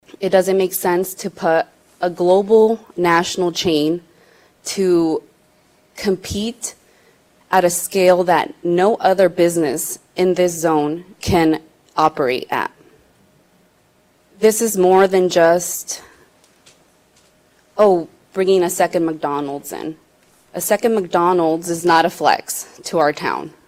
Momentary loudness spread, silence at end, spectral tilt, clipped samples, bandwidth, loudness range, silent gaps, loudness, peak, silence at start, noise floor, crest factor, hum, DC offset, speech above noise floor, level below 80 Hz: 12 LU; 0.2 s; -4.5 dB/octave; under 0.1%; 16.5 kHz; 5 LU; none; -17 LUFS; 0 dBFS; 0.2 s; -57 dBFS; 16 dB; none; under 0.1%; 40 dB; -50 dBFS